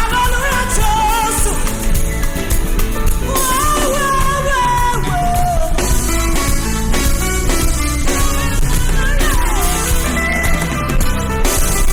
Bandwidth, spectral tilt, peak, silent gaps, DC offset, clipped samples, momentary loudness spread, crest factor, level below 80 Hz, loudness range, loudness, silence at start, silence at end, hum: 19 kHz; -3.5 dB/octave; -2 dBFS; none; under 0.1%; under 0.1%; 4 LU; 12 dB; -16 dBFS; 1 LU; -16 LUFS; 0 s; 0 s; none